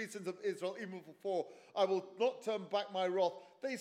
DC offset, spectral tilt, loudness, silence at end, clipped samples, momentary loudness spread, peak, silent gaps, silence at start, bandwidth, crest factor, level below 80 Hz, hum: under 0.1%; -4.5 dB/octave; -38 LUFS; 0 s; under 0.1%; 10 LU; -20 dBFS; none; 0 s; 15 kHz; 18 dB; under -90 dBFS; none